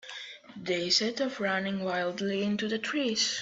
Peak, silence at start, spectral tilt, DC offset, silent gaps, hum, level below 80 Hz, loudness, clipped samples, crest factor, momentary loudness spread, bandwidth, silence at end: -12 dBFS; 0.05 s; -3 dB/octave; under 0.1%; none; none; -72 dBFS; -29 LUFS; under 0.1%; 20 dB; 15 LU; 8.2 kHz; 0 s